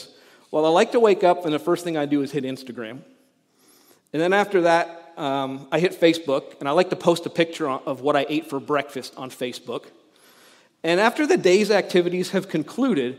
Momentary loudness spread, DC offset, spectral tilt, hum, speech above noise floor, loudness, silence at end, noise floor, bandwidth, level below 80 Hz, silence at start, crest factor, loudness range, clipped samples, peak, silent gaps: 14 LU; under 0.1%; -5 dB/octave; none; 40 dB; -22 LUFS; 0 s; -61 dBFS; 15.5 kHz; -78 dBFS; 0 s; 20 dB; 4 LU; under 0.1%; -4 dBFS; none